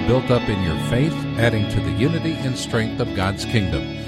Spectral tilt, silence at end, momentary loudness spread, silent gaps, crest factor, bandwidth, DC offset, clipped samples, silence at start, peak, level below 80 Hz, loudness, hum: -6 dB/octave; 0 s; 4 LU; none; 16 dB; 13.5 kHz; under 0.1%; under 0.1%; 0 s; -4 dBFS; -36 dBFS; -21 LUFS; none